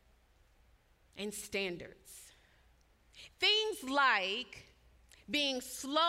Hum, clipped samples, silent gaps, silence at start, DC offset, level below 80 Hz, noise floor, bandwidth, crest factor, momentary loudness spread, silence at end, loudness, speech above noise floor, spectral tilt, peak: none; under 0.1%; none; 1.15 s; under 0.1%; -68 dBFS; -68 dBFS; 16 kHz; 22 dB; 25 LU; 0 s; -33 LUFS; 33 dB; -1.5 dB/octave; -16 dBFS